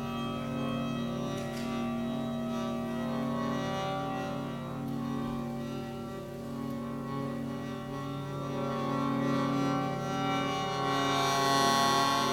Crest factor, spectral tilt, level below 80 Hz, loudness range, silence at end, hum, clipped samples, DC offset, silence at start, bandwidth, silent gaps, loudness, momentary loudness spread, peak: 16 dB; -5 dB/octave; -56 dBFS; 8 LU; 0 s; none; under 0.1%; under 0.1%; 0 s; 17 kHz; none; -32 LUFS; 11 LU; -16 dBFS